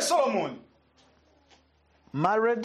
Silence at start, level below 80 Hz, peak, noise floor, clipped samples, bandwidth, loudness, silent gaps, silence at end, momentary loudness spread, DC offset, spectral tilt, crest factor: 0 s; -70 dBFS; -12 dBFS; -64 dBFS; under 0.1%; 13 kHz; -27 LUFS; none; 0 s; 14 LU; under 0.1%; -4 dB/octave; 18 dB